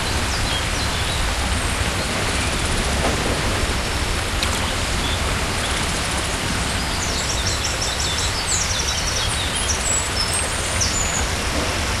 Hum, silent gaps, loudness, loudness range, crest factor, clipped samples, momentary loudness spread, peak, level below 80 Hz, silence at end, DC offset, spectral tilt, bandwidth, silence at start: none; none; -20 LUFS; 2 LU; 16 dB; under 0.1%; 2 LU; -4 dBFS; -28 dBFS; 0 s; under 0.1%; -2.5 dB/octave; 15.5 kHz; 0 s